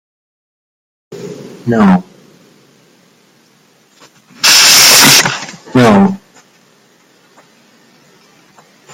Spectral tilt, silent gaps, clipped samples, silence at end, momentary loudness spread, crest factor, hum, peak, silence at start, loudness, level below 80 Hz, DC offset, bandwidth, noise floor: -2.5 dB/octave; none; 0.4%; 2.75 s; 26 LU; 14 dB; none; 0 dBFS; 1.1 s; -6 LUFS; -50 dBFS; under 0.1%; over 20 kHz; -49 dBFS